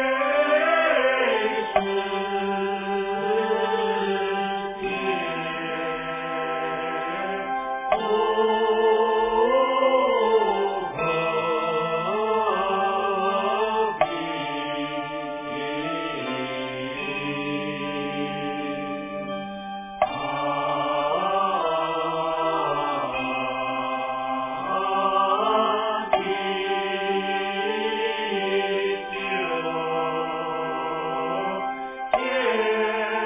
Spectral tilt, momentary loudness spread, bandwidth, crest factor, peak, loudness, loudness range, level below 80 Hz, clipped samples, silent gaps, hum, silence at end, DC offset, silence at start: -8.5 dB/octave; 8 LU; 3.8 kHz; 18 dB; -6 dBFS; -24 LUFS; 7 LU; -58 dBFS; under 0.1%; none; none; 0 s; under 0.1%; 0 s